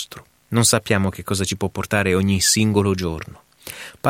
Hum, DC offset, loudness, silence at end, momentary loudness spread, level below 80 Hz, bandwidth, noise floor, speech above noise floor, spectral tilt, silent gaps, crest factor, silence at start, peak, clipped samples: none; under 0.1%; -19 LUFS; 0 s; 18 LU; -46 dBFS; 17 kHz; -39 dBFS; 20 dB; -4 dB/octave; none; 18 dB; 0 s; -2 dBFS; under 0.1%